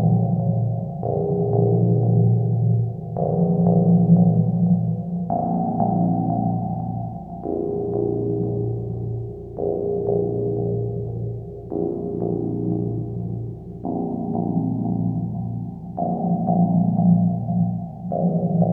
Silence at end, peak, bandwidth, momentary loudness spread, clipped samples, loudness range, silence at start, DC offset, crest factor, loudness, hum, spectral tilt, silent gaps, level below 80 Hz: 0 s; -4 dBFS; 1.3 kHz; 11 LU; under 0.1%; 7 LU; 0 s; under 0.1%; 16 dB; -22 LUFS; none; -15 dB/octave; none; -48 dBFS